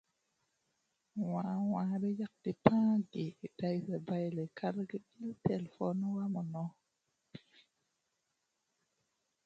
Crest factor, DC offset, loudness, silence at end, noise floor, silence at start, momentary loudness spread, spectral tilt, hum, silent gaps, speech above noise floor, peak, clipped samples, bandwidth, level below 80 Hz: 28 dB; under 0.1%; -37 LUFS; 2.1 s; -84 dBFS; 1.15 s; 14 LU; -9 dB/octave; none; none; 48 dB; -10 dBFS; under 0.1%; 7.6 kHz; -72 dBFS